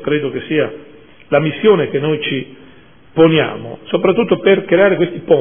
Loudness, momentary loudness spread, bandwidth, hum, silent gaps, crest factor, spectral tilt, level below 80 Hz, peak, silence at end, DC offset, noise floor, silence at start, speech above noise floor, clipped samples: -15 LUFS; 10 LU; 3.6 kHz; none; none; 14 dB; -10.5 dB/octave; -54 dBFS; 0 dBFS; 0 s; 0.5%; -44 dBFS; 0 s; 30 dB; under 0.1%